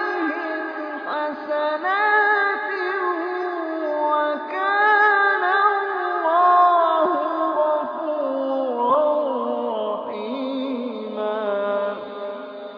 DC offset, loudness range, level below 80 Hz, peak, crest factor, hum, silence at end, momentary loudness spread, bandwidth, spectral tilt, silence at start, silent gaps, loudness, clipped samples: under 0.1%; 6 LU; -80 dBFS; -4 dBFS; 16 dB; none; 0 s; 11 LU; 5.4 kHz; -6 dB/octave; 0 s; none; -21 LUFS; under 0.1%